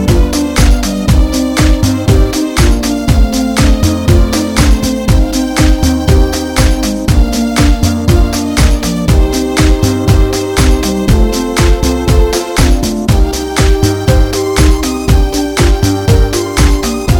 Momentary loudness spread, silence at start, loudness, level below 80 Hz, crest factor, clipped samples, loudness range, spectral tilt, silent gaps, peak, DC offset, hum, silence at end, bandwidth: 2 LU; 0 s; -11 LUFS; -12 dBFS; 8 dB; under 0.1%; 1 LU; -5.5 dB/octave; none; 0 dBFS; under 0.1%; none; 0 s; 17.5 kHz